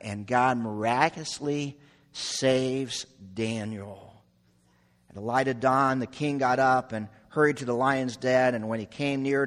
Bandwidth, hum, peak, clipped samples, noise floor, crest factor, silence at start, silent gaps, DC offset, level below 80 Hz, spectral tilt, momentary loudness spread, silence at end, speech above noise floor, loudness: 12.5 kHz; none; -6 dBFS; under 0.1%; -64 dBFS; 22 dB; 0.05 s; none; under 0.1%; -64 dBFS; -5 dB/octave; 13 LU; 0 s; 38 dB; -27 LUFS